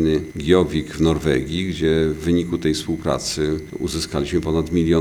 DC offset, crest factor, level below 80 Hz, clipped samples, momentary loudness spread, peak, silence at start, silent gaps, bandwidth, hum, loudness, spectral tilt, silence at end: under 0.1%; 18 dB; -38 dBFS; under 0.1%; 6 LU; -2 dBFS; 0 s; none; 19.5 kHz; none; -21 LUFS; -6 dB/octave; 0 s